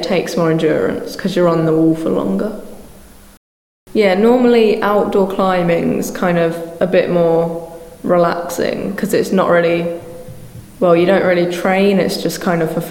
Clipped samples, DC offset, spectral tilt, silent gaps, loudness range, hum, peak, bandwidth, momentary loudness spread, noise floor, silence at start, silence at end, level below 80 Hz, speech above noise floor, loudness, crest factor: under 0.1%; 0.1%; -6 dB/octave; 3.37-3.86 s; 3 LU; none; 0 dBFS; 17 kHz; 10 LU; -39 dBFS; 0 s; 0 s; -46 dBFS; 25 dB; -15 LUFS; 14 dB